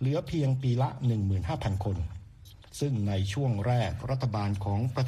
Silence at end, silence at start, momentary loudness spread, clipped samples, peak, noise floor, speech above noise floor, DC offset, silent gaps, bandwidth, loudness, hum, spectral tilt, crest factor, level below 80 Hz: 0 s; 0 s; 6 LU; under 0.1%; -16 dBFS; -51 dBFS; 22 dB; under 0.1%; none; 12.5 kHz; -30 LUFS; none; -7.5 dB/octave; 12 dB; -48 dBFS